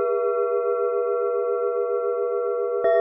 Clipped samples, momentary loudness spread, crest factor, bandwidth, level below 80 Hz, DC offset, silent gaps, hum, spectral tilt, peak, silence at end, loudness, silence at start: under 0.1%; 2 LU; 12 dB; 3.6 kHz; -74 dBFS; under 0.1%; none; none; -8 dB/octave; -10 dBFS; 0 s; -24 LUFS; 0 s